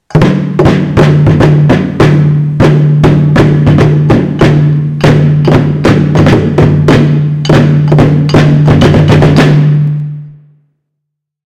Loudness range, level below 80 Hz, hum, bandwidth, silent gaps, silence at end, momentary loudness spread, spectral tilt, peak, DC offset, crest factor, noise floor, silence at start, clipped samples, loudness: 1 LU; -26 dBFS; none; 8 kHz; none; 1.15 s; 4 LU; -8 dB/octave; 0 dBFS; under 0.1%; 6 dB; -72 dBFS; 0.1 s; 2%; -7 LUFS